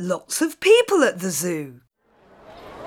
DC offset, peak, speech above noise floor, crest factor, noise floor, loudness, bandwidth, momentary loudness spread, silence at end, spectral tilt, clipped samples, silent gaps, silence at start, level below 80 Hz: under 0.1%; -4 dBFS; 36 dB; 18 dB; -56 dBFS; -20 LUFS; 19.5 kHz; 13 LU; 0 s; -3.5 dB/octave; under 0.1%; none; 0 s; -64 dBFS